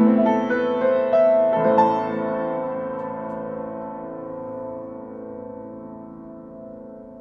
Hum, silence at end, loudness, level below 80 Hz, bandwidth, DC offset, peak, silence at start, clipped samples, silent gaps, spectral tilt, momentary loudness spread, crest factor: none; 0 s; -22 LUFS; -60 dBFS; 6.6 kHz; under 0.1%; -4 dBFS; 0 s; under 0.1%; none; -8.5 dB/octave; 21 LU; 18 dB